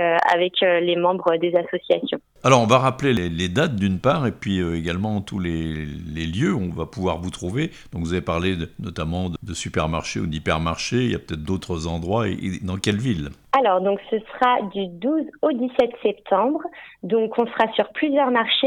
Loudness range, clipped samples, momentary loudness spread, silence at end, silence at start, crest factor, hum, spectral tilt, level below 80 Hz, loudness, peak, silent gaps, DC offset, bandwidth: 6 LU; under 0.1%; 10 LU; 0 s; 0 s; 20 dB; none; -5.5 dB/octave; -44 dBFS; -22 LUFS; 0 dBFS; none; under 0.1%; 15.5 kHz